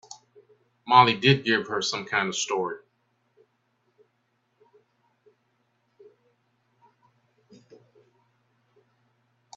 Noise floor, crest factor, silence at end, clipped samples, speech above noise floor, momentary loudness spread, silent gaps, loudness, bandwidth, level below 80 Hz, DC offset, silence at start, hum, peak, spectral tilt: -73 dBFS; 28 dB; 6.8 s; under 0.1%; 50 dB; 26 LU; none; -22 LUFS; 7.8 kHz; -70 dBFS; under 0.1%; 0.85 s; none; -2 dBFS; -4 dB/octave